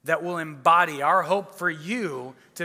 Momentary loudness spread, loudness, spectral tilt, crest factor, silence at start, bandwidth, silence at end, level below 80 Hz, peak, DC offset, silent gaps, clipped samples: 13 LU; -23 LUFS; -4.5 dB/octave; 18 dB; 0.05 s; 16 kHz; 0 s; -78 dBFS; -6 dBFS; under 0.1%; none; under 0.1%